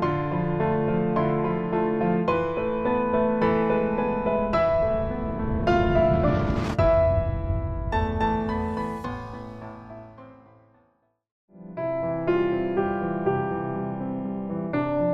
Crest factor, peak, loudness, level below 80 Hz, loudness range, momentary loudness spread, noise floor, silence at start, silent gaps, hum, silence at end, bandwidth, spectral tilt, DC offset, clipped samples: 16 dB; -8 dBFS; -25 LUFS; -38 dBFS; 9 LU; 11 LU; -68 dBFS; 0 s; 11.31-11.48 s; none; 0 s; 8 kHz; -9 dB/octave; under 0.1%; under 0.1%